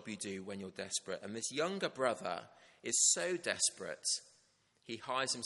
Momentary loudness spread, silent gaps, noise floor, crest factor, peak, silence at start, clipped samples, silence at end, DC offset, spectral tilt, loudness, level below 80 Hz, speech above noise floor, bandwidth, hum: 16 LU; none; -73 dBFS; 22 dB; -16 dBFS; 0 s; under 0.1%; 0 s; under 0.1%; -1.5 dB/octave; -36 LUFS; -84 dBFS; 35 dB; 11.5 kHz; none